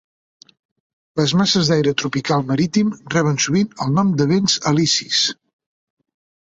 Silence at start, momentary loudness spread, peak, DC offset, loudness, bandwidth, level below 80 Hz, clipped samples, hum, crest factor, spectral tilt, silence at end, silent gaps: 1.15 s; 5 LU; -4 dBFS; under 0.1%; -18 LUFS; 8.2 kHz; -56 dBFS; under 0.1%; none; 16 dB; -4.5 dB/octave; 1.15 s; none